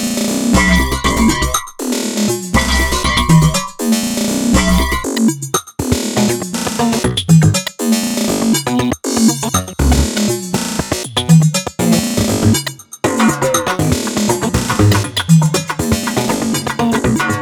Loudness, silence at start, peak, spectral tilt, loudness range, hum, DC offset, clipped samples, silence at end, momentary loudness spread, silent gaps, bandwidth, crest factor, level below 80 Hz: -14 LUFS; 0 s; 0 dBFS; -4.5 dB/octave; 1 LU; none; under 0.1%; under 0.1%; 0 s; 7 LU; none; 20 kHz; 14 dB; -26 dBFS